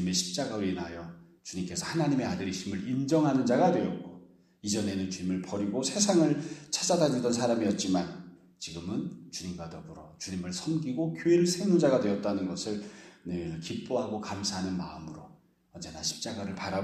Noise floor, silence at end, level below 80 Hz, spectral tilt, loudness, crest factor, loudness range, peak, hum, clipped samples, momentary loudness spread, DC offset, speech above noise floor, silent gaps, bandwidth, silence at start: -55 dBFS; 0 s; -64 dBFS; -5 dB/octave; -30 LUFS; 20 dB; 7 LU; -10 dBFS; none; under 0.1%; 17 LU; under 0.1%; 25 dB; none; 13.5 kHz; 0 s